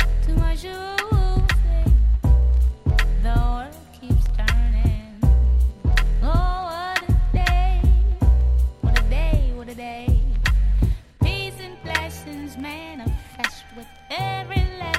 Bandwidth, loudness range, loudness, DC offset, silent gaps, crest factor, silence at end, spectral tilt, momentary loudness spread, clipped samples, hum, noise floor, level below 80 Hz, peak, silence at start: 13 kHz; 6 LU; -22 LUFS; under 0.1%; none; 14 dB; 0 s; -6 dB/octave; 13 LU; under 0.1%; none; -42 dBFS; -20 dBFS; -4 dBFS; 0 s